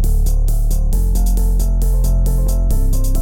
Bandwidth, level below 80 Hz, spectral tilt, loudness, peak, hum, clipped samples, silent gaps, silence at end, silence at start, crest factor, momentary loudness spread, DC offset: 16.5 kHz; -14 dBFS; -6.5 dB/octave; -18 LUFS; -4 dBFS; none; under 0.1%; none; 0 s; 0 s; 8 dB; 2 LU; under 0.1%